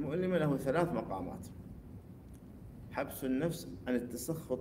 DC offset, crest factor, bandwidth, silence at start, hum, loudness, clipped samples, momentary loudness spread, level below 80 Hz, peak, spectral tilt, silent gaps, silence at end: under 0.1%; 20 dB; 16 kHz; 0 s; none; -36 LUFS; under 0.1%; 20 LU; -58 dBFS; -18 dBFS; -6.5 dB/octave; none; 0 s